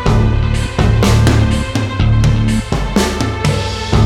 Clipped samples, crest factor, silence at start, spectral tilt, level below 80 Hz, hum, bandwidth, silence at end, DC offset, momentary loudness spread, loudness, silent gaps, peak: under 0.1%; 12 dB; 0 s; -6 dB/octave; -18 dBFS; none; 13.5 kHz; 0 s; under 0.1%; 6 LU; -14 LUFS; none; 0 dBFS